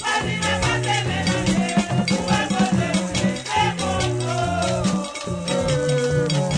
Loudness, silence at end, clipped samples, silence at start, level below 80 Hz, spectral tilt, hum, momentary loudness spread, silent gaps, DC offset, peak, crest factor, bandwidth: -21 LUFS; 0 s; under 0.1%; 0 s; -42 dBFS; -4.5 dB/octave; none; 3 LU; none; under 0.1%; -6 dBFS; 14 dB; 10 kHz